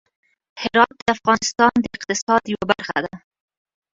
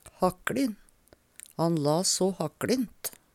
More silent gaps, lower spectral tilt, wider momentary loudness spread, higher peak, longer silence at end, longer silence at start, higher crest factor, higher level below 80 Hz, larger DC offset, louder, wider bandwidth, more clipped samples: first, 1.02-1.06 s, 2.22-2.27 s vs none; second, -3 dB/octave vs -4.5 dB/octave; second, 8 LU vs 15 LU; first, 0 dBFS vs -12 dBFS; first, 0.8 s vs 0.25 s; first, 0.55 s vs 0.05 s; about the same, 20 dB vs 18 dB; first, -54 dBFS vs -60 dBFS; neither; first, -19 LUFS vs -28 LUFS; second, 7.8 kHz vs 17 kHz; neither